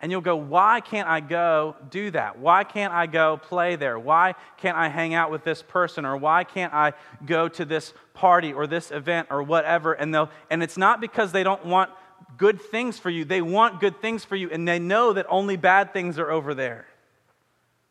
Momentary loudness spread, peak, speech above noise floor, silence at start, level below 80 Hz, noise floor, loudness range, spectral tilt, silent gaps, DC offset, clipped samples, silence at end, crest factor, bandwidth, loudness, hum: 9 LU; -4 dBFS; 45 dB; 0 s; -76 dBFS; -68 dBFS; 2 LU; -5.5 dB/octave; none; under 0.1%; under 0.1%; 1.1 s; 20 dB; 12 kHz; -23 LUFS; none